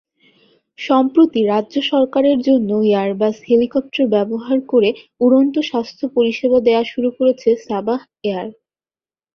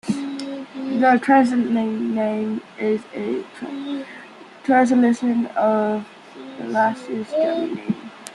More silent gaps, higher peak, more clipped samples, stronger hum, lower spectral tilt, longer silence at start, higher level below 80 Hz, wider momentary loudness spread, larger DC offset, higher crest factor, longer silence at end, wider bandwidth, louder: neither; about the same, -2 dBFS vs -4 dBFS; neither; neither; about the same, -6.5 dB/octave vs -6 dB/octave; first, 0.8 s vs 0.05 s; first, -60 dBFS vs -68 dBFS; second, 8 LU vs 15 LU; neither; about the same, 14 dB vs 18 dB; first, 0.85 s vs 0 s; second, 6.8 kHz vs 11 kHz; first, -16 LUFS vs -21 LUFS